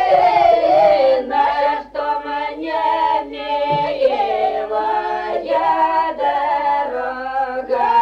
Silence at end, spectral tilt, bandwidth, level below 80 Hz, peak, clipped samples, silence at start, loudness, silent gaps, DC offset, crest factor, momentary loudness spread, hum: 0 s; -5.5 dB/octave; 8 kHz; -50 dBFS; -4 dBFS; under 0.1%; 0 s; -17 LUFS; none; under 0.1%; 14 dB; 9 LU; none